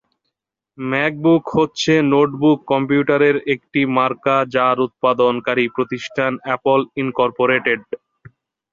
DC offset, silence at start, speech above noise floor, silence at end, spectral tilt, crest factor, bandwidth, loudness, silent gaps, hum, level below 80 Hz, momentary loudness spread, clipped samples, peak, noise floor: under 0.1%; 0.8 s; 62 dB; 0.75 s; -6 dB/octave; 16 dB; 7.6 kHz; -17 LUFS; none; none; -58 dBFS; 7 LU; under 0.1%; -2 dBFS; -79 dBFS